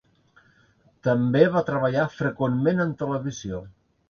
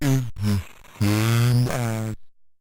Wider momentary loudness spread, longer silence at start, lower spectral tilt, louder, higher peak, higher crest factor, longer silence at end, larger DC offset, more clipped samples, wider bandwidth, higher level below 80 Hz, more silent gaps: about the same, 12 LU vs 13 LU; first, 1.05 s vs 0 s; first, -7.5 dB/octave vs -6 dB/octave; about the same, -24 LUFS vs -23 LUFS; first, -4 dBFS vs -10 dBFS; first, 22 dB vs 12 dB; about the same, 0.4 s vs 0.3 s; neither; neither; second, 7.2 kHz vs 17 kHz; second, -56 dBFS vs -46 dBFS; neither